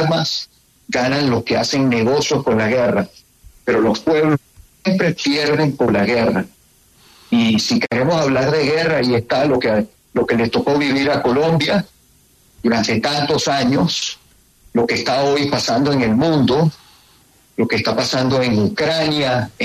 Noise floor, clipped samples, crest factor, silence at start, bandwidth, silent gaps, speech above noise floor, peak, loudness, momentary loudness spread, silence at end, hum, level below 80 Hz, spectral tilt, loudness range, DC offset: -53 dBFS; under 0.1%; 14 dB; 0 s; 13.5 kHz; none; 37 dB; -4 dBFS; -17 LUFS; 6 LU; 0 s; none; -50 dBFS; -5 dB/octave; 1 LU; under 0.1%